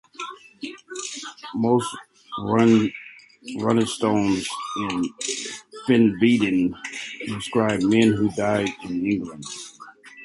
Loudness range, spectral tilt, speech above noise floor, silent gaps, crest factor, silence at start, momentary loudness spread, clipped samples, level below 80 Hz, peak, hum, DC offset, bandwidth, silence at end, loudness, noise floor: 3 LU; -5 dB/octave; 24 dB; none; 18 dB; 0.2 s; 18 LU; under 0.1%; -56 dBFS; -6 dBFS; none; under 0.1%; 11.5 kHz; 0 s; -22 LUFS; -45 dBFS